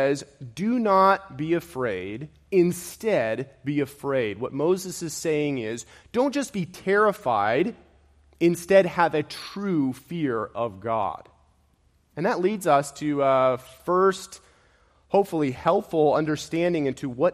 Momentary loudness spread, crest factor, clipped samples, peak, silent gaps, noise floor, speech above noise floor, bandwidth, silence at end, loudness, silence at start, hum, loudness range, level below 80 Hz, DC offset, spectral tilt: 10 LU; 18 dB; under 0.1%; -6 dBFS; none; -64 dBFS; 40 dB; 15 kHz; 0 s; -24 LUFS; 0 s; none; 4 LU; -60 dBFS; under 0.1%; -5.5 dB/octave